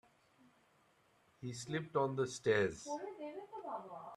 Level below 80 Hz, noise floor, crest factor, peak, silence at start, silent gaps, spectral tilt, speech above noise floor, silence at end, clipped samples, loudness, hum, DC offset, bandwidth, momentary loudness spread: -76 dBFS; -72 dBFS; 22 dB; -20 dBFS; 1.4 s; none; -5 dB/octave; 34 dB; 0 s; under 0.1%; -40 LUFS; none; under 0.1%; 12 kHz; 14 LU